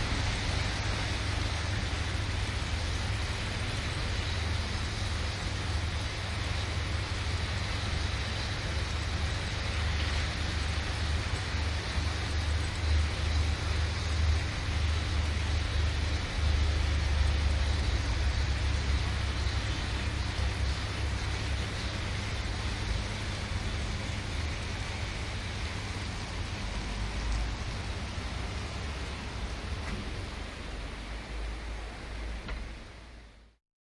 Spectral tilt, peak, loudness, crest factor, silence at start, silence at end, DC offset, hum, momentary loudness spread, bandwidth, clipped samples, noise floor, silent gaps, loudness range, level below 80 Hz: -4.5 dB/octave; -16 dBFS; -33 LUFS; 16 dB; 0 s; 0.5 s; under 0.1%; none; 8 LU; 11.5 kHz; under 0.1%; -52 dBFS; none; 7 LU; -36 dBFS